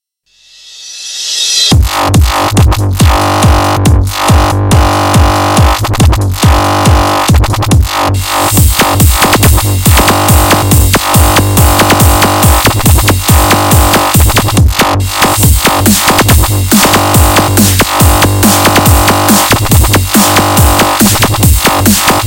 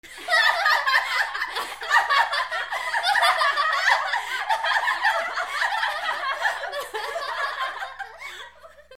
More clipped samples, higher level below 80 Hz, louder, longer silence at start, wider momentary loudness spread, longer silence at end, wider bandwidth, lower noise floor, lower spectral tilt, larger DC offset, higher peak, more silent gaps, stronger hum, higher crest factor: first, 2% vs under 0.1%; first, -14 dBFS vs -64 dBFS; first, -7 LUFS vs -22 LUFS; first, 0.7 s vs 0.05 s; second, 3 LU vs 11 LU; about the same, 0 s vs 0.05 s; first, over 20 kHz vs 17 kHz; about the same, -47 dBFS vs -47 dBFS; first, -4 dB/octave vs 1.5 dB/octave; second, under 0.1% vs 0.1%; first, 0 dBFS vs -6 dBFS; neither; neither; second, 6 dB vs 20 dB